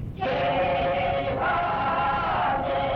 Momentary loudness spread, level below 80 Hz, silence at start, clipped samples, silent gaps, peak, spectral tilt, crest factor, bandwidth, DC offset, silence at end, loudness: 2 LU; -42 dBFS; 0 s; under 0.1%; none; -14 dBFS; -7.5 dB/octave; 10 dB; 6.2 kHz; under 0.1%; 0 s; -25 LUFS